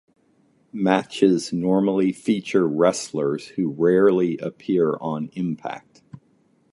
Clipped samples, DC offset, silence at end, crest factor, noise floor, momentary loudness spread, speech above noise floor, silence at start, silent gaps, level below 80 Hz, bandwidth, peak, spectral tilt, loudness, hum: under 0.1%; under 0.1%; 0.55 s; 20 dB; -61 dBFS; 10 LU; 41 dB; 0.75 s; none; -64 dBFS; 11.5 kHz; -2 dBFS; -6 dB/octave; -22 LUFS; none